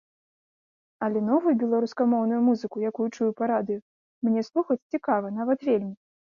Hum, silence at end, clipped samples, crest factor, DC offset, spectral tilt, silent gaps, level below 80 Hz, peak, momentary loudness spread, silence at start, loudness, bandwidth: none; 0.45 s; under 0.1%; 16 dB; under 0.1%; -8 dB/octave; 3.82-4.21 s, 4.82-4.90 s; -74 dBFS; -10 dBFS; 7 LU; 1 s; -26 LUFS; 7 kHz